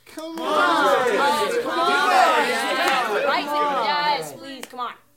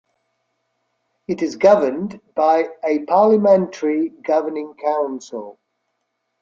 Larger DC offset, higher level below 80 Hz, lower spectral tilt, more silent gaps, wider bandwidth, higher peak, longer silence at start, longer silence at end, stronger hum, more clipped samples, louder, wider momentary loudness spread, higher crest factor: neither; about the same, -70 dBFS vs -66 dBFS; second, -2 dB/octave vs -6.5 dB/octave; neither; first, 16.5 kHz vs 7.4 kHz; about the same, -4 dBFS vs -2 dBFS; second, 0.1 s vs 1.3 s; second, 0.2 s vs 0.9 s; neither; neither; about the same, -20 LUFS vs -18 LUFS; about the same, 15 LU vs 15 LU; about the same, 16 dB vs 18 dB